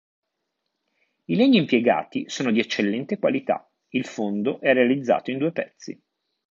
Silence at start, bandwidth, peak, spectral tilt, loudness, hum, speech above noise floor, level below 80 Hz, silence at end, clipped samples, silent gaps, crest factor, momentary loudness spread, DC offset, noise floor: 1.3 s; 7.6 kHz; -4 dBFS; -5.5 dB/octave; -23 LUFS; none; 57 dB; -74 dBFS; 0.6 s; under 0.1%; none; 18 dB; 12 LU; under 0.1%; -79 dBFS